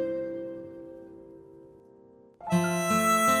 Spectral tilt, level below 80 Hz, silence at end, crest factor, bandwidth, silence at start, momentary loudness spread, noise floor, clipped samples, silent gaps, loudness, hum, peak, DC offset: -4.5 dB/octave; -68 dBFS; 0 s; 16 dB; over 20 kHz; 0 s; 25 LU; -55 dBFS; under 0.1%; none; -27 LUFS; none; -14 dBFS; under 0.1%